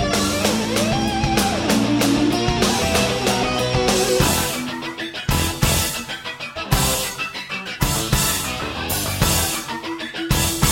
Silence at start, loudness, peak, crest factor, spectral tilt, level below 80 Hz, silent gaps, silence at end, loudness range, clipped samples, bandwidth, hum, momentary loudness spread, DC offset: 0 s; -20 LUFS; -2 dBFS; 18 dB; -3.5 dB/octave; -32 dBFS; none; 0 s; 3 LU; under 0.1%; 16.5 kHz; none; 10 LU; under 0.1%